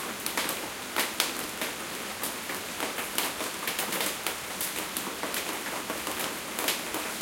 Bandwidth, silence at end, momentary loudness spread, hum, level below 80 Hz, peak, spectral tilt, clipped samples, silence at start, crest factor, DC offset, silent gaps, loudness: 17 kHz; 0 s; 4 LU; none; -64 dBFS; -4 dBFS; -1 dB/octave; under 0.1%; 0 s; 30 dB; under 0.1%; none; -31 LUFS